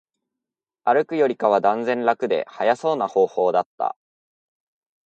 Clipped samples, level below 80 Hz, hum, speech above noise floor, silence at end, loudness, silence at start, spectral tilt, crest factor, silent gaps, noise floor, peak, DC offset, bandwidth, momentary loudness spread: under 0.1%; -76 dBFS; none; 67 dB; 1.15 s; -21 LUFS; 0.85 s; -6 dB/octave; 18 dB; 3.66-3.78 s; -87 dBFS; -4 dBFS; under 0.1%; 8.6 kHz; 8 LU